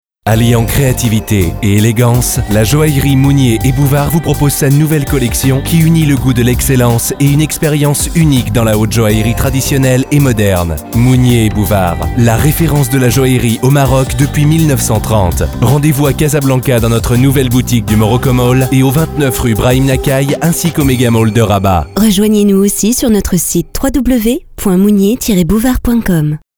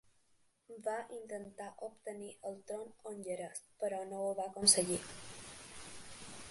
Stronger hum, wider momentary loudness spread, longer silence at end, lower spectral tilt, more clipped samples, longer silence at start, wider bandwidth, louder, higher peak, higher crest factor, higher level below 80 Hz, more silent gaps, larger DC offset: neither; second, 3 LU vs 20 LU; first, 0.2 s vs 0 s; first, -5.5 dB/octave vs -2 dB/octave; first, 0.2% vs under 0.1%; second, 0.25 s vs 0.7 s; first, over 20 kHz vs 12 kHz; first, -10 LUFS vs -37 LUFS; first, 0 dBFS vs -12 dBFS; second, 10 dB vs 28 dB; first, -24 dBFS vs -72 dBFS; neither; first, 0.2% vs under 0.1%